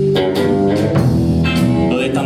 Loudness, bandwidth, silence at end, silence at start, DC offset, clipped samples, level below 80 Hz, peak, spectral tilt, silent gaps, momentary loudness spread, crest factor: -14 LUFS; 15.5 kHz; 0 s; 0 s; under 0.1%; under 0.1%; -32 dBFS; -2 dBFS; -7.5 dB/octave; none; 1 LU; 12 dB